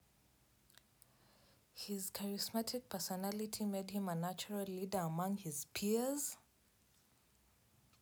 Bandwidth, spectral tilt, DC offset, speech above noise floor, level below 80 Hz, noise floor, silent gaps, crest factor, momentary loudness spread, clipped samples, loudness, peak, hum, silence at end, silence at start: over 20 kHz; -4.5 dB/octave; under 0.1%; 32 dB; -78 dBFS; -73 dBFS; none; 16 dB; 6 LU; under 0.1%; -41 LUFS; -26 dBFS; none; 1.6 s; 1.75 s